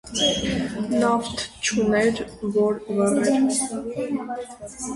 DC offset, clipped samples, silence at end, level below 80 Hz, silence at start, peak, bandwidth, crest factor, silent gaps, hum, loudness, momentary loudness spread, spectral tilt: under 0.1%; under 0.1%; 0 s; -48 dBFS; 0.05 s; -8 dBFS; 11.5 kHz; 16 dB; none; none; -23 LUFS; 9 LU; -3.5 dB/octave